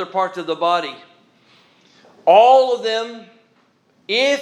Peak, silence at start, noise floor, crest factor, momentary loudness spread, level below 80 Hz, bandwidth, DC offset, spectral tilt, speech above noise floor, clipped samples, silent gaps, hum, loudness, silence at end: 0 dBFS; 0 s; -59 dBFS; 18 dB; 13 LU; -86 dBFS; 10.5 kHz; under 0.1%; -3 dB/octave; 43 dB; under 0.1%; none; none; -16 LUFS; 0 s